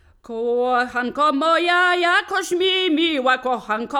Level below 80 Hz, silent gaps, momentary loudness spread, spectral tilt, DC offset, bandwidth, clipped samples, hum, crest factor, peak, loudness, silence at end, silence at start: -60 dBFS; none; 7 LU; -2 dB/octave; under 0.1%; 16.5 kHz; under 0.1%; none; 14 dB; -6 dBFS; -19 LUFS; 0 s; 0.3 s